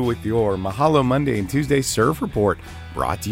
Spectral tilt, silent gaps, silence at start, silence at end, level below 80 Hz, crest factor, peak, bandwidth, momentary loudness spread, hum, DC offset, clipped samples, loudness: -5.5 dB/octave; none; 0 s; 0 s; -40 dBFS; 16 dB; -4 dBFS; 16 kHz; 7 LU; none; under 0.1%; under 0.1%; -20 LUFS